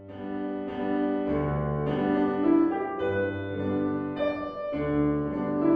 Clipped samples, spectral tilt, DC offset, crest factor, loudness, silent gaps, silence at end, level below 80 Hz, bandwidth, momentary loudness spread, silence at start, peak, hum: under 0.1%; -10.5 dB/octave; under 0.1%; 16 dB; -28 LUFS; none; 0 s; -48 dBFS; 5.2 kHz; 9 LU; 0 s; -12 dBFS; none